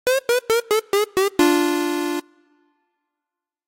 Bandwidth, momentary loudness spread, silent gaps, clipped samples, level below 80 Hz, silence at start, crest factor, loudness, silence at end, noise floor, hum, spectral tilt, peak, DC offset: 16.5 kHz; 7 LU; none; under 0.1%; -58 dBFS; 0.05 s; 16 dB; -20 LUFS; 1.45 s; -86 dBFS; none; -2.5 dB/octave; -6 dBFS; under 0.1%